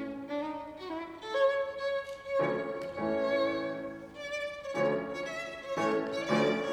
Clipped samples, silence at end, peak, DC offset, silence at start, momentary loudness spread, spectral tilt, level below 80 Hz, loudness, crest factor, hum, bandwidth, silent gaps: under 0.1%; 0 s; -16 dBFS; under 0.1%; 0 s; 11 LU; -5 dB/octave; -66 dBFS; -33 LUFS; 16 dB; none; 11.5 kHz; none